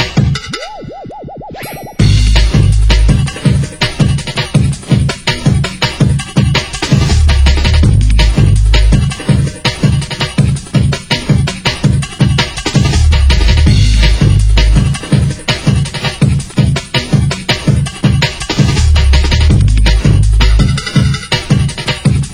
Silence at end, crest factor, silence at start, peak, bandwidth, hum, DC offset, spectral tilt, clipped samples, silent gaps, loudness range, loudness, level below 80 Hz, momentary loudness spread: 0 s; 10 dB; 0 s; 0 dBFS; 12.5 kHz; none; under 0.1%; -5.5 dB/octave; 0.1%; none; 2 LU; -11 LUFS; -14 dBFS; 5 LU